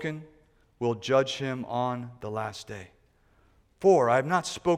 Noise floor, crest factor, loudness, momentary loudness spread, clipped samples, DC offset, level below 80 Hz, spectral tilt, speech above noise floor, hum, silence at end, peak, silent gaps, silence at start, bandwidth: -63 dBFS; 18 dB; -27 LUFS; 17 LU; under 0.1%; under 0.1%; -64 dBFS; -5.5 dB/octave; 37 dB; none; 0 s; -10 dBFS; none; 0 s; 12.5 kHz